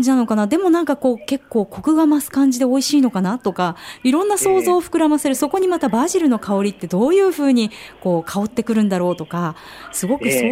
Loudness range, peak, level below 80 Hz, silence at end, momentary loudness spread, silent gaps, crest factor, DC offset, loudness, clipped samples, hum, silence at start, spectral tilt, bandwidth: 2 LU; -6 dBFS; -56 dBFS; 0 s; 8 LU; none; 12 dB; under 0.1%; -18 LUFS; under 0.1%; none; 0 s; -5 dB/octave; 16 kHz